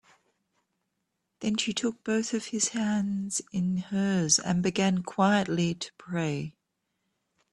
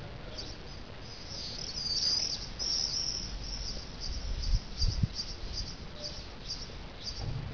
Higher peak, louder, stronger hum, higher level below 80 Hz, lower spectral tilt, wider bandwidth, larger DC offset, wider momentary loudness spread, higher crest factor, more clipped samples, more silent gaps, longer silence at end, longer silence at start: first, -8 dBFS vs -16 dBFS; first, -28 LUFS vs -32 LUFS; neither; second, -66 dBFS vs -40 dBFS; about the same, -4 dB/octave vs -3 dB/octave; first, 11.5 kHz vs 5.4 kHz; second, under 0.1% vs 0.3%; second, 8 LU vs 16 LU; about the same, 20 dB vs 18 dB; neither; neither; first, 1.05 s vs 0 s; first, 1.4 s vs 0 s